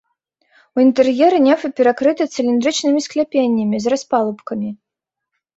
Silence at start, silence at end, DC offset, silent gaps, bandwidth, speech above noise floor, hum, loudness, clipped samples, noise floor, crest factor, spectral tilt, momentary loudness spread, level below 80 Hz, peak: 0.75 s; 0.85 s; under 0.1%; none; 8 kHz; 66 dB; none; -16 LUFS; under 0.1%; -81 dBFS; 16 dB; -4.5 dB/octave; 11 LU; -62 dBFS; -2 dBFS